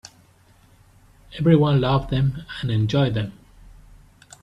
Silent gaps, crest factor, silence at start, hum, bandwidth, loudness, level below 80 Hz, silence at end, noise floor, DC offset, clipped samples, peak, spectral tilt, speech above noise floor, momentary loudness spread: none; 20 dB; 1.3 s; none; 8.8 kHz; -21 LUFS; -44 dBFS; 1.1 s; -55 dBFS; under 0.1%; under 0.1%; -4 dBFS; -8 dB/octave; 35 dB; 12 LU